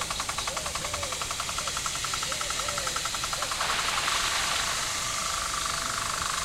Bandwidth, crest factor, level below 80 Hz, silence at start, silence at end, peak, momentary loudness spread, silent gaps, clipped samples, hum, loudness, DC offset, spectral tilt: 16 kHz; 16 dB; -48 dBFS; 0 s; 0 s; -14 dBFS; 5 LU; none; under 0.1%; none; -28 LUFS; under 0.1%; -0.5 dB/octave